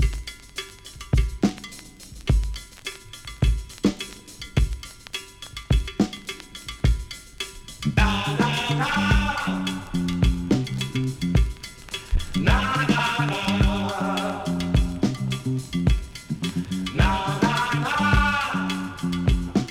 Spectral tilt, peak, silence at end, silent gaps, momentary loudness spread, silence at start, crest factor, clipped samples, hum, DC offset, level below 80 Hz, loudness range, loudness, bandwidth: -5.5 dB/octave; -6 dBFS; 0 s; none; 14 LU; 0 s; 18 dB; under 0.1%; none; under 0.1%; -28 dBFS; 5 LU; -24 LUFS; 15 kHz